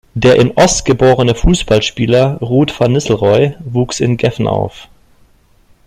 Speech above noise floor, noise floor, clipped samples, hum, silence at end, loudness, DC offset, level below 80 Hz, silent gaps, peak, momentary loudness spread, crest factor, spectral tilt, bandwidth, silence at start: 37 dB; -49 dBFS; under 0.1%; none; 1.05 s; -12 LUFS; under 0.1%; -26 dBFS; none; 0 dBFS; 6 LU; 12 dB; -5.5 dB/octave; 13 kHz; 0.15 s